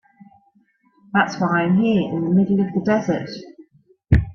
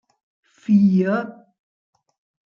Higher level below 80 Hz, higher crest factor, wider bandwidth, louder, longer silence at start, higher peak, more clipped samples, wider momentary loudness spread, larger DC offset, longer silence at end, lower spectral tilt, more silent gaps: first, -34 dBFS vs -68 dBFS; about the same, 18 dB vs 16 dB; first, 6.6 kHz vs 5.6 kHz; about the same, -19 LUFS vs -18 LUFS; first, 1.15 s vs 0.7 s; first, -2 dBFS vs -6 dBFS; neither; second, 7 LU vs 20 LU; neither; second, 0 s vs 1.2 s; second, -7.5 dB/octave vs -9.5 dB/octave; neither